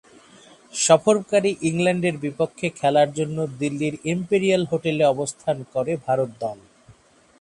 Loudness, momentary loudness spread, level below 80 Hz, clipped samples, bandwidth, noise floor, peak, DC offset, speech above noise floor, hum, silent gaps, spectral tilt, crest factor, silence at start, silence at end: -22 LUFS; 9 LU; -62 dBFS; under 0.1%; 11.5 kHz; -53 dBFS; -2 dBFS; under 0.1%; 31 dB; none; none; -5 dB/octave; 22 dB; 0.75 s; 0.85 s